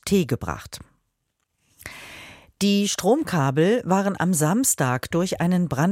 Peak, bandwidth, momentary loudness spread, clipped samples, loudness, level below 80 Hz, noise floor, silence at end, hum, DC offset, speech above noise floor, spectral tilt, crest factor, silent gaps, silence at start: -6 dBFS; 16.5 kHz; 20 LU; under 0.1%; -22 LUFS; -52 dBFS; -75 dBFS; 0 s; none; under 0.1%; 54 dB; -5 dB/octave; 16 dB; none; 0.05 s